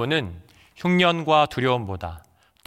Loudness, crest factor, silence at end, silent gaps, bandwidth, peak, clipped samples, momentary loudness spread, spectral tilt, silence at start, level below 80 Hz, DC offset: -21 LUFS; 18 dB; 0.5 s; none; 13.5 kHz; -4 dBFS; under 0.1%; 15 LU; -6 dB/octave; 0 s; -54 dBFS; under 0.1%